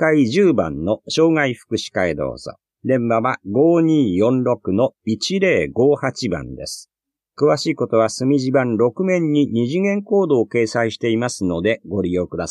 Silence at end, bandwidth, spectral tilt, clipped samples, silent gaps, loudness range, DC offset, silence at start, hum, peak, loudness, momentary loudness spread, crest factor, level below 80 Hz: 0 s; 12 kHz; -6 dB/octave; under 0.1%; none; 2 LU; under 0.1%; 0 s; none; -4 dBFS; -18 LUFS; 9 LU; 14 dB; -50 dBFS